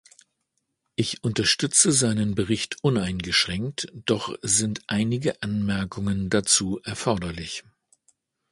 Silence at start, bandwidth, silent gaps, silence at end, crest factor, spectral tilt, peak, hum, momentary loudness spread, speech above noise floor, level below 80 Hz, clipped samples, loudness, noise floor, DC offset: 1 s; 11.5 kHz; none; 0.9 s; 22 dB; -3.5 dB/octave; -4 dBFS; none; 11 LU; 53 dB; -50 dBFS; under 0.1%; -23 LUFS; -77 dBFS; under 0.1%